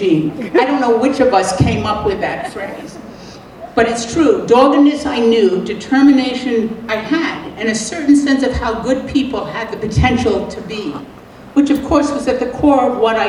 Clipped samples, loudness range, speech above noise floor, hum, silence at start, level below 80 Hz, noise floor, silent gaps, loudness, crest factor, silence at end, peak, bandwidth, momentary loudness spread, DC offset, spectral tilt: under 0.1%; 4 LU; 20 dB; none; 0 s; -34 dBFS; -34 dBFS; none; -15 LUFS; 14 dB; 0 s; 0 dBFS; 11.5 kHz; 13 LU; under 0.1%; -5.5 dB/octave